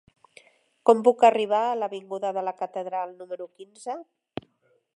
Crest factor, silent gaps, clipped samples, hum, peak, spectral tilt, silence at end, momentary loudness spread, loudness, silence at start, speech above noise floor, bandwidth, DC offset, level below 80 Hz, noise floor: 24 dB; none; under 0.1%; none; -2 dBFS; -5 dB/octave; 0.95 s; 21 LU; -24 LUFS; 0.85 s; 44 dB; 11 kHz; under 0.1%; -74 dBFS; -68 dBFS